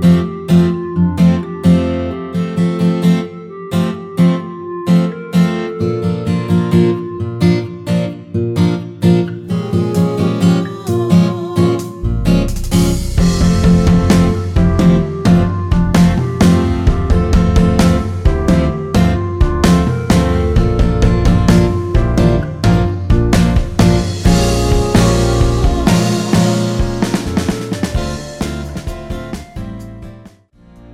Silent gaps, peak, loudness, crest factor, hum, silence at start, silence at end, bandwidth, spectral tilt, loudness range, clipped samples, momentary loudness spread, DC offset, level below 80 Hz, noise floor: none; 0 dBFS; -14 LUFS; 12 dB; none; 0 s; 0 s; 14 kHz; -7 dB/octave; 4 LU; under 0.1%; 9 LU; under 0.1%; -20 dBFS; -44 dBFS